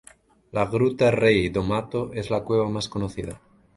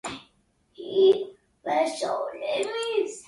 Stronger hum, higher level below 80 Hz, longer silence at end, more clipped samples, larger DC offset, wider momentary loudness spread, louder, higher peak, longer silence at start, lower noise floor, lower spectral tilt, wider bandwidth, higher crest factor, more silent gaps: neither; first, -46 dBFS vs -68 dBFS; first, 0.4 s vs 0.05 s; neither; neither; second, 12 LU vs 18 LU; about the same, -24 LUFS vs -25 LUFS; first, -4 dBFS vs -10 dBFS; first, 0.55 s vs 0.05 s; second, -51 dBFS vs -66 dBFS; first, -6.5 dB/octave vs -3 dB/octave; about the same, 11.5 kHz vs 11.5 kHz; about the same, 20 dB vs 18 dB; neither